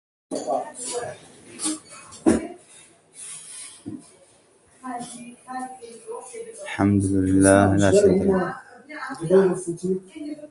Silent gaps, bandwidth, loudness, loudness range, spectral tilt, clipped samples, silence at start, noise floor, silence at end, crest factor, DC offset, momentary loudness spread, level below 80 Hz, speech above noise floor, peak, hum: none; 11.5 kHz; -22 LUFS; 17 LU; -5.5 dB/octave; under 0.1%; 0.3 s; -57 dBFS; 0.05 s; 22 dB; under 0.1%; 22 LU; -46 dBFS; 37 dB; -2 dBFS; none